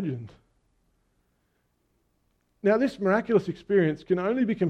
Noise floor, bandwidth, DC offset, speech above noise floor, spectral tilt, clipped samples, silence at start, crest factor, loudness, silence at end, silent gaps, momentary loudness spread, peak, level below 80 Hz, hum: -72 dBFS; 8.8 kHz; under 0.1%; 47 dB; -8.5 dB/octave; under 0.1%; 0 s; 18 dB; -25 LUFS; 0 s; none; 5 LU; -10 dBFS; -64 dBFS; none